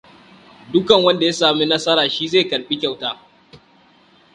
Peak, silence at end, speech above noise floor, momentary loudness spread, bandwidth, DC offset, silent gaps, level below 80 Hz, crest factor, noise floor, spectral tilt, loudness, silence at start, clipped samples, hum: 0 dBFS; 0.8 s; 35 dB; 10 LU; 10.5 kHz; under 0.1%; none; -60 dBFS; 18 dB; -52 dBFS; -4 dB/octave; -17 LUFS; 0.7 s; under 0.1%; none